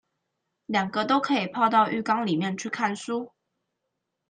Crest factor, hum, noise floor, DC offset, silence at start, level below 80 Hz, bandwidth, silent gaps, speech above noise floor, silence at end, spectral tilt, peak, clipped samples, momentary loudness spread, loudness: 20 dB; none; -81 dBFS; under 0.1%; 0.7 s; -74 dBFS; 9.8 kHz; none; 56 dB; 1 s; -5 dB/octave; -8 dBFS; under 0.1%; 10 LU; -25 LUFS